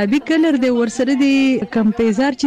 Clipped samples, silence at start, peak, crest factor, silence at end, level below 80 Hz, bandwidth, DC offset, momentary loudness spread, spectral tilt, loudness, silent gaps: under 0.1%; 0 s; -8 dBFS; 8 dB; 0 s; -48 dBFS; 9.6 kHz; under 0.1%; 3 LU; -5.5 dB/octave; -16 LUFS; none